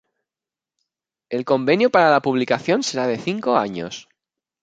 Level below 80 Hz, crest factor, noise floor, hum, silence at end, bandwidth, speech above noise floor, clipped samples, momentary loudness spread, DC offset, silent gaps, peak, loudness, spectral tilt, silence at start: -66 dBFS; 20 dB; -90 dBFS; none; 0.6 s; 9.2 kHz; 71 dB; under 0.1%; 14 LU; under 0.1%; none; -2 dBFS; -19 LUFS; -5 dB/octave; 1.3 s